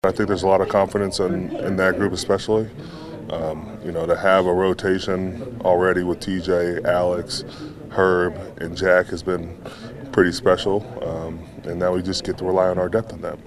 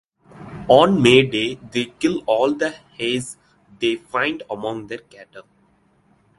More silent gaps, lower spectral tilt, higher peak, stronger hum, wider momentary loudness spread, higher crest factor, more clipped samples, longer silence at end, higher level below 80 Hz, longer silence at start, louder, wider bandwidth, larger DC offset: neither; about the same, -5.5 dB/octave vs -5 dB/octave; about the same, -2 dBFS vs 0 dBFS; neither; second, 14 LU vs 19 LU; about the same, 20 dB vs 20 dB; neither; second, 0 s vs 0.95 s; first, -46 dBFS vs -54 dBFS; second, 0.05 s vs 0.35 s; about the same, -21 LUFS vs -19 LUFS; first, 13 kHz vs 11.5 kHz; neither